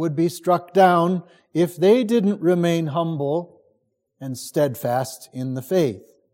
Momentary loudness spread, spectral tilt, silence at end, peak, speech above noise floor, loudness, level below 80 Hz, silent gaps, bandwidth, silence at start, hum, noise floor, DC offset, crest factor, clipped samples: 14 LU; -6.5 dB/octave; 0.35 s; -4 dBFS; 49 dB; -21 LUFS; -68 dBFS; none; 17 kHz; 0 s; none; -69 dBFS; under 0.1%; 18 dB; under 0.1%